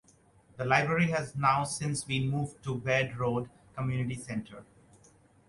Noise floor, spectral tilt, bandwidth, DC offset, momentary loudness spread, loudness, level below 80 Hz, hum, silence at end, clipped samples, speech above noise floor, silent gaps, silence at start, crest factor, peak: -62 dBFS; -5.5 dB/octave; 11.5 kHz; under 0.1%; 11 LU; -30 LUFS; -60 dBFS; none; 0.85 s; under 0.1%; 32 dB; none; 0.55 s; 22 dB; -10 dBFS